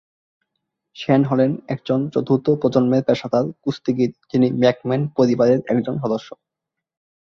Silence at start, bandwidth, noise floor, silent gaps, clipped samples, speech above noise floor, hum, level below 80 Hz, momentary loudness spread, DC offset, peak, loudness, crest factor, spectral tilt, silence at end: 0.95 s; 6.8 kHz; -84 dBFS; none; under 0.1%; 65 dB; none; -58 dBFS; 8 LU; under 0.1%; -2 dBFS; -19 LUFS; 18 dB; -8 dB/octave; 0.85 s